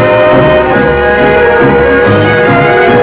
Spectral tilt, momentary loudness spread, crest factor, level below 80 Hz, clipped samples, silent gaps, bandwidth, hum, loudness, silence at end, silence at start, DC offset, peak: -10 dB/octave; 2 LU; 6 dB; -26 dBFS; under 0.1%; none; 4 kHz; none; -6 LUFS; 0 s; 0 s; under 0.1%; 0 dBFS